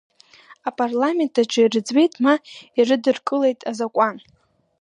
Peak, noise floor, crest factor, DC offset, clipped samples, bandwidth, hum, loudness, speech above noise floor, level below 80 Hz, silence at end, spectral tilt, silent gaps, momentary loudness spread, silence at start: -4 dBFS; -50 dBFS; 16 dB; under 0.1%; under 0.1%; 10.5 kHz; none; -20 LUFS; 30 dB; -74 dBFS; 0.6 s; -4 dB/octave; none; 8 LU; 0.5 s